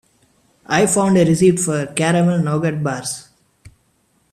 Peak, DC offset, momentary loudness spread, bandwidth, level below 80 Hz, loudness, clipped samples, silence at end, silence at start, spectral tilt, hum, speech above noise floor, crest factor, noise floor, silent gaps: -2 dBFS; under 0.1%; 9 LU; 14.5 kHz; -54 dBFS; -17 LUFS; under 0.1%; 1.1 s; 0.7 s; -5.5 dB/octave; none; 46 dB; 16 dB; -61 dBFS; none